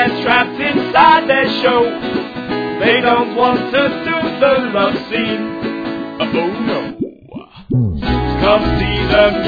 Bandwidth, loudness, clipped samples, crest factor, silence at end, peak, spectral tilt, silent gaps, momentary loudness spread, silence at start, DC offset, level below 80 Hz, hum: 5 kHz; -15 LUFS; under 0.1%; 14 dB; 0 s; 0 dBFS; -7.5 dB/octave; none; 10 LU; 0 s; under 0.1%; -32 dBFS; none